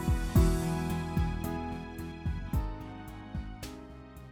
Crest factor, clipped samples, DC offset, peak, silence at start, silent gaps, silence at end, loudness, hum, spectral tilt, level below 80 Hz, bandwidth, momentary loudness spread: 18 dB; under 0.1%; under 0.1%; -14 dBFS; 0 s; none; 0 s; -33 LUFS; none; -6.5 dB/octave; -36 dBFS; 19 kHz; 17 LU